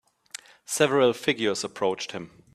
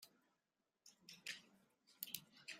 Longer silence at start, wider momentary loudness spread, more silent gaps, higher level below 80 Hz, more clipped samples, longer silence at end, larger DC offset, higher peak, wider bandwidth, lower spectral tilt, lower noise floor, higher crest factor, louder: first, 0.7 s vs 0 s; first, 21 LU vs 18 LU; neither; first, -68 dBFS vs under -90 dBFS; neither; first, 0.25 s vs 0 s; neither; first, -4 dBFS vs -22 dBFS; second, 14.5 kHz vs 16 kHz; first, -3.5 dB/octave vs 0 dB/octave; second, -46 dBFS vs under -90 dBFS; second, 22 dB vs 36 dB; first, -25 LUFS vs -53 LUFS